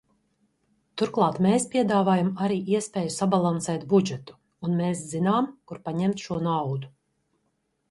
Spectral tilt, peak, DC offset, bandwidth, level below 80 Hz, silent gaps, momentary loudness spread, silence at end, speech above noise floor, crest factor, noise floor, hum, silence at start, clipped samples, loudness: -6 dB/octave; -8 dBFS; under 0.1%; 11.5 kHz; -64 dBFS; none; 11 LU; 1 s; 50 dB; 18 dB; -74 dBFS; none; 0.95 s; under 0.1%; -25 LUFS